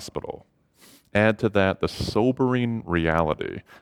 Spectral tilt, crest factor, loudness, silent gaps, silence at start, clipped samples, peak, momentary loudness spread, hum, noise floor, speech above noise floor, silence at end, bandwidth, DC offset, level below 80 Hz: -6.5 dB/octave; 20 dB; -24 LUFS; none; 0 s; under 0.1%; -6 dBFS; 13 LU; none; -55 dBFS; 31 dB; 0.05 s; 15.5 kHz; under 0.1%; -46 dBFS